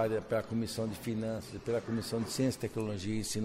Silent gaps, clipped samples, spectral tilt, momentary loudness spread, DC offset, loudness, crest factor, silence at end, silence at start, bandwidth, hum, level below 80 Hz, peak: none; under 0.1%; -5.5 dB/octave; 4 LU; under 0.1%; -35 LUFS; 16 dB; 0 s; 0 s; 16 kHz; none; -58 dBFS; -18 dBFS